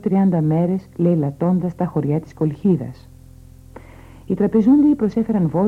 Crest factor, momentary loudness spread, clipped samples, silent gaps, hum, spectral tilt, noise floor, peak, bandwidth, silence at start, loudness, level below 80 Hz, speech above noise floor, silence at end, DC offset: 14 dB; 8 LU; under 0.1%; none; none; -11 dB/octave; -43 dBFS; -6 dBFS; 6.2 kHz; 0.05 s; -18 LUFS; -48 dBFS; 25 dB; 0 s; under 0.1%